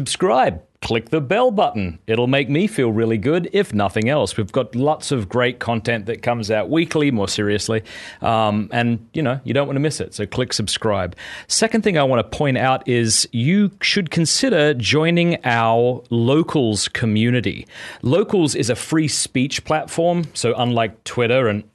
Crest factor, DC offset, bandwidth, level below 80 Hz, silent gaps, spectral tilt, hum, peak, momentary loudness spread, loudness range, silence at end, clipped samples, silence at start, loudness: 16 dB; under 0.1%; 12 kHz; -50 dBFS; none; -4.5 dB/octave; none; -2 dBFS; 6 LU; 4 LU; 0.1 s; under 0.1%; 0 s; -19 LUFS